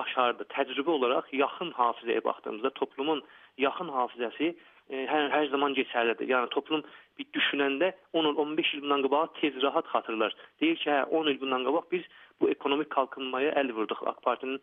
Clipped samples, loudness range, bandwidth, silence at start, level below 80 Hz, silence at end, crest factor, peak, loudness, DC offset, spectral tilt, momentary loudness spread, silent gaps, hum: under 0.1%; 3 LU; 3.9 kHz; 0 s; -86 dBFS; 0.05 s; 20 dB; -10 dBFS; -29 LUFS; under 0.1%; -7 dB/octave; 6 LU; none; none